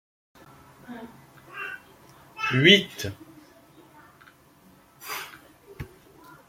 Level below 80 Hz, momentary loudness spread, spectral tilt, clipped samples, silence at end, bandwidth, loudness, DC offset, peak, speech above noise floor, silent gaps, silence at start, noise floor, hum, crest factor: -62 dBFS; 27 LU; -4.5 dB/octave; under 0.1%; 0.65 s; 16.5 kHz; -23 LUFS; under 0.1%; -2 dBFS; 34 dB; none; 0.9 s; -56 dBFS; none; 28 dB